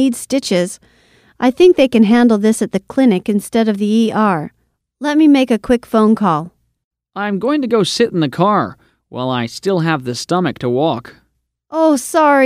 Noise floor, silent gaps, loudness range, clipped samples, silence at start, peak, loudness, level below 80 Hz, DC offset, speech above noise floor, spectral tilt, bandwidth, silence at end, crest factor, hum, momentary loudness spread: -64 dBFS; 6.84-6.91 s; 4 LU; under 0.1%; 0 s; 0 dBFS; -15 LUFS; -52 dBFS; under 0.1%; 50 dB; -5.5 dB/octave; 15.5 kHz; 0 s; 14 dB; none; 13 LU